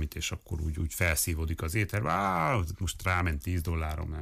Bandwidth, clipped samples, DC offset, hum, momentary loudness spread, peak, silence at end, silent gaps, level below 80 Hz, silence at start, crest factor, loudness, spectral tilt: 16 kHz; under 0.1%; under 0.1%; none; 7 LU; -16 dBFS; 0 s; none; -38 dBFS; 0 s; 14 dB; -30 LUFS; -4.5 dB/octave